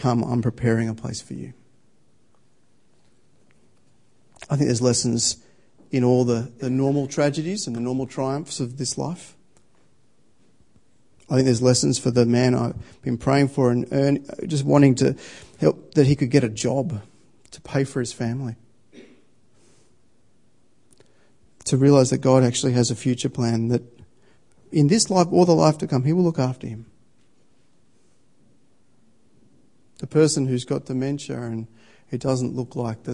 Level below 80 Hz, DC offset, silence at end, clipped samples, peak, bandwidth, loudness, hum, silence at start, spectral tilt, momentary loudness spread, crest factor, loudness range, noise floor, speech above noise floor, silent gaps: -56 dBFS; 0.2%; 0 s; under 0.1%; -2 dBFS; 11 kHz; -21 LUFS; none; 0 s; -6 dB/octave; 14 LU; 22 dB; 11 LU; -64 dBFS; 43 dB; none